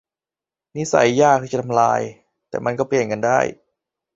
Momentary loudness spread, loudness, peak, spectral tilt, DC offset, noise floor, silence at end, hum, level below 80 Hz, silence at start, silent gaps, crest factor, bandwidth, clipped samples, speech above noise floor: 13 LU; -19 LUFS; 0 dBFS; -5 dB/octave; under 0.1%; -90 dBFS; 0.6 s; none; -58 dBFS; 0.75 s; none; 20 dB; 8 kHz; under 0.1%; 72 dB